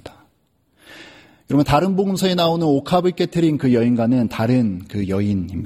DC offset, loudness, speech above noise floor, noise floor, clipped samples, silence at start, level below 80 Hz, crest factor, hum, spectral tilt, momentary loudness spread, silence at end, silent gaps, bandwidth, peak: under 0.1%; -18 LUFS; 45 dB; -63 dBFS; under 0.1%; 0.05 s; -46 dBFS; 18 dB; none; -7 dB/octave; 5 LU; 0 s; none; 15.5 kHz; -2 dBFS